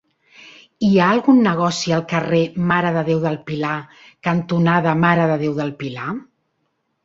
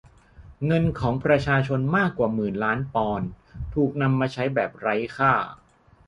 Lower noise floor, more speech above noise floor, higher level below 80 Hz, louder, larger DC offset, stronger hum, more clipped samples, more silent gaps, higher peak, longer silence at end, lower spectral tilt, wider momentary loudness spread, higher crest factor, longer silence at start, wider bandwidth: first, -70 dBFS vs -49 dBFS; first, 53 dB vs 26 dB; second, -56 dBFS vs -46 dBFS; first, -18 LUFS vs -24 LUFS; neither; neither; neither; neither; first, -2 dBFS vs -6 dBFS; first, 0.8 s vs 0.55 s; second, -6.5 dB/octave vs -8 dB/octave; first, 12 LU vs 9 LU; about the same, 16 dB vs 18 dB; about the same, 0.45 s vs 0.4 s; second, 7.8 kHz vs 10.5 kHz